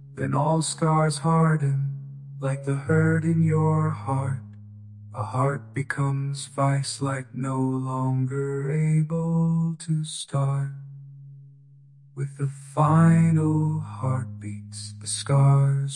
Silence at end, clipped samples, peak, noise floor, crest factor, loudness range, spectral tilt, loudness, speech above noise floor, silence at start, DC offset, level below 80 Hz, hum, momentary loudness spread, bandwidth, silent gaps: 0 s; under 0.1%; -8 dBFS; -52 dBFS; 16 dB; 5 LU; -6.5 dB/octave; -24 LUFS; 28 dB; 0 s; under 0.1%; -62 dBFS; none; 15 LU; 11.5 kHz; none